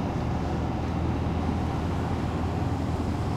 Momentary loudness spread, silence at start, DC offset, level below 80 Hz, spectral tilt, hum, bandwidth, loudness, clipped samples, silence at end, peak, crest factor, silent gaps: 1 LU; 0 s; under 0.1%; -36 dBFS; -7.5 dB/octave; none; 11.5 kHz; -29 LUFS; under 0.1%; 0 s; -16 dBFS; 12 dB; none